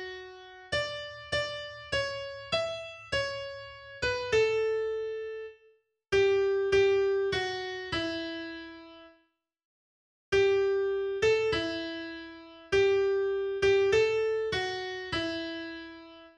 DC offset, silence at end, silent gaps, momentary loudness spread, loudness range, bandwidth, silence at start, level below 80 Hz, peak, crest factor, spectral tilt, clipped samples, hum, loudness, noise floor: under 0.1%; 0.1 s; 9.65-10.32 s; 18 LU; 5 LU; 9.4 kHz; 0 s; -56 dBFS; -14 dBFS; 16 dB; -4 dB/octave; under 0.1%; none; -29 LUFS; -72 dBFS